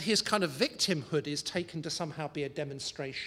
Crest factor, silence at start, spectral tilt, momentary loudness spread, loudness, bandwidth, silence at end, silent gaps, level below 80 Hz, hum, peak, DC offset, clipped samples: 22 dB; 0 s; -3.5 dB/octave; 9 LU; -32 LUFS; 16 kHz; 0 s; none; -68 dBFS; none; -10 dBFS; under 0.1%; under 0.1%